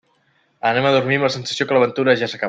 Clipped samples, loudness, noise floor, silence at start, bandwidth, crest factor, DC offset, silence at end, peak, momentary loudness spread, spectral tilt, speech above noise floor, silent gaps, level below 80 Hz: under 0.1%; -18 LUFS; -62 dBFS; 0.65 s; 9 kHz; 16 dB; under 0.1%; 0 s; -2 dBFS; 5 LU; -5 dB/octave; 44 dB; none; -62 dBFS